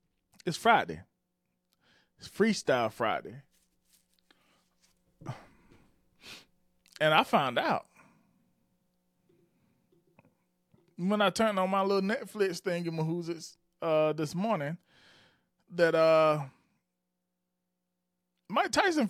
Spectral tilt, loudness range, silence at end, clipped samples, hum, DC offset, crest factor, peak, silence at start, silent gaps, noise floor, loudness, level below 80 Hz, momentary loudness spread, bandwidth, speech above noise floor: -5 dB/octave; 9 LU; 0 s; under 0.1%; none; under 0.1%; 22 dB; -10 dBFS; 0.45 s; none; -84 dBFS; -29 LUFS; -72 dBFS; 21 LU; 15.5 kHz; 56 dB